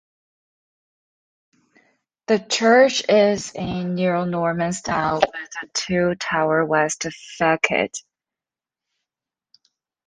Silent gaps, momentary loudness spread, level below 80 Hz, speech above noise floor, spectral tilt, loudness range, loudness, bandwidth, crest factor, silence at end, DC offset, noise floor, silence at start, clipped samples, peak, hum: none; 11 LU; -56 dBFS; 70 dB; -4 dB/octave; 4 LU; -20 LUFS; 10 kHz; 20 dB; 2.1 s; under 0.1%; -90 dBFS; 2.3 s; under 0.1%; -2 dBFS; none